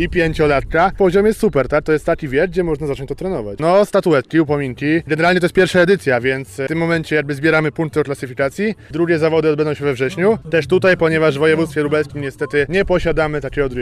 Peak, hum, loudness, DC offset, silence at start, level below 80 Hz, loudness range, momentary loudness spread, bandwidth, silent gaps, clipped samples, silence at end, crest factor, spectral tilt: -4 dBFS; none; -16 LUFS; under 0.1%; 0 s; -36 dBFS; 2 LU; 7 LU; 14.5 kHz; none; under 0.1%; 0 s; 12 dB; -6.5 dB/octave